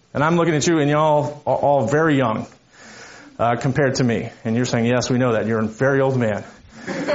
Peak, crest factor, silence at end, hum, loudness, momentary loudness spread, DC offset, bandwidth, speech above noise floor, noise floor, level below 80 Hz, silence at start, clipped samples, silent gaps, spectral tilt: -4 dBFS; 16 dB; 0 s; none; -19 LUFS; 12 LU; under 0.1%; 8 kHz; 24 dB; -42 dBFS; -54 dBFS; 0.15 s; under 0.1%; none; -5.5 dB/octave